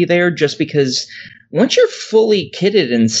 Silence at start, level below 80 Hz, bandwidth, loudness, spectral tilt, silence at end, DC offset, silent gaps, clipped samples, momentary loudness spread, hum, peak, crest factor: 0 s; -66 dBFS; 8.2 kHz; -15 LUFS; -4.5 dB/octave; 0 s; under 0.1%; none; under 0.1%; 8 LU; none; -2 dBFS; 14 dB